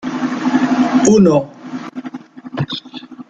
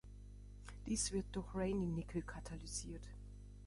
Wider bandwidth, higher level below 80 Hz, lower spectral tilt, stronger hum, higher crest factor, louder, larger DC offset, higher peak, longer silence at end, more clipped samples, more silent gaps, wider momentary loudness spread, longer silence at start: second, 9.2 kHz vs 11.5 kHz; about the same, -54 dBFS vs -52 dBFS; about the same, -5.5 dB/octave vs -4.5 dB/octave; second, none vs 50 Hz at -50 dBFS; about the same, 14 dB vs 18 dB; first, -14 LUFS vs -43 LUFS; neither; first, -2 dBFS vs -26 dBFS; about the same, 0.05 s vs 0 s; neither; neither; about the same, 20 LU vs 18 LU; about the same, 0 s vs 0.05 s